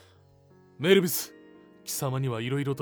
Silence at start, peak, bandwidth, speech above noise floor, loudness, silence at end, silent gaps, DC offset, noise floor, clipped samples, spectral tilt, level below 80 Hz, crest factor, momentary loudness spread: 0.8 s; -8 dBFS; over 20 kHz; 32 dB; -27 LUFS; 0 s; none; under 0.1%; -58 dBFS; under 0.1%; -4.5 dB/octave; -72 dBFS; 20 dB; 14 LU